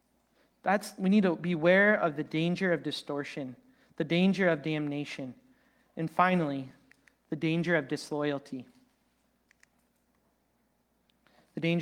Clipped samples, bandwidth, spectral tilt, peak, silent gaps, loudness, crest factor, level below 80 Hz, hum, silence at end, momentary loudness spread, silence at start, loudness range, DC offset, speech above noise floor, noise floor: under 0.1%; 12.5 kHz; -6.5 dB/octave; -10 dBFS; none; -29 LUFS; 22 dB; -76 dBFS; none; 0 s; 16 LU; 0.65 s; 9 LU; under 0.1%; 44 dB; -73 dBFS